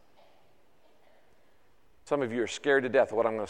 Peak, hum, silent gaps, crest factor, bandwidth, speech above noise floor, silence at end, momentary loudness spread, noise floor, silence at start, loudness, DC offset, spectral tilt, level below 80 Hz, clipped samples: -12 dBFS; none; none; 20 dB; 10 kHz; 39 dB; 0 s; 7 LU; -67 dBFS; 2.05 s; -28 LUFS; 0.1%; -4.5 dB/octave; -72 dBFS; under 0.1%